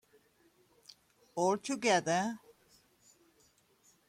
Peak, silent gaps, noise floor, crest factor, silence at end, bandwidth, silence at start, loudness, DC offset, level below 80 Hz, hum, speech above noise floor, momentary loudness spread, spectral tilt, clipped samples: -18 dBFS; none; -69 dBFS; 20 dB; 1.7 s; 16 kHz; 1.35 s; -32 LUFS; under 0.1%; -78 dBFS; none; 38 dB; 14 LU; -3.5 dB/octave; under 0.1%